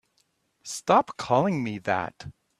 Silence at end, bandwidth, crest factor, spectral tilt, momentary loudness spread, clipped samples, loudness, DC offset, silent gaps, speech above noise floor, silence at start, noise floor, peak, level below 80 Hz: 0.3 s; 14 kHz; 22 dB; -5 dB/octave; 16 LU; under 0.1%; -25 LUFS; under 0.1%; none; 45 dB; 0.65 s; -71 dBFS; -6 dBFS; -64 dBFS